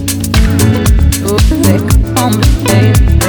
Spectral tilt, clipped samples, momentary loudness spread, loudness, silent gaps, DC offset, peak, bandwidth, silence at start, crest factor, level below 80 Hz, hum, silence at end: -5.5 dB/octave; 0.6%; 3 LU; -10 LUFS; none; under 0.1%; 0 dBFS; 19.5 kHz; 0 s; 8 dB; -12 dBFS; none; 0 s